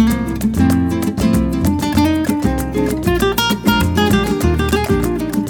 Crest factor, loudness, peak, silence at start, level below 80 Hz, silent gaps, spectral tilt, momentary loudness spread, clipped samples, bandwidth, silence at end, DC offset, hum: 14 dB; -16 LUFS; 0 dBFS; 0 s; -26 dBFS; none; -5.5 dB/octave; 4 LU; under 0.1%; 19 kHz; 0 s; under 0.1%; none